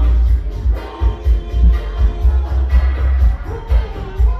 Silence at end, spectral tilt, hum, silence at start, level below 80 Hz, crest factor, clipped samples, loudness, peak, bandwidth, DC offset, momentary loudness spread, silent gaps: 0 s; -8.5 dB/octave; none; 0 s; -14 dBFS; 10 dB; under 0.1%; -18 LUFS; -2 dBFS; 4.6 kHz; under 0.1%; 5 LU; none